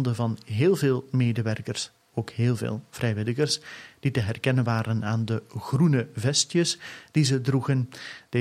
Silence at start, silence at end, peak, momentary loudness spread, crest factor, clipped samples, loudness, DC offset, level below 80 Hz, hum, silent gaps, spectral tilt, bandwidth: 0 s; 0 s; -8 dBFS; 10 LU; 16 dB; under 0.1%; -26 LUFS; under 0.1%; -62 dBFS; none; none; -5.5 dB/octave; 14.5 kHz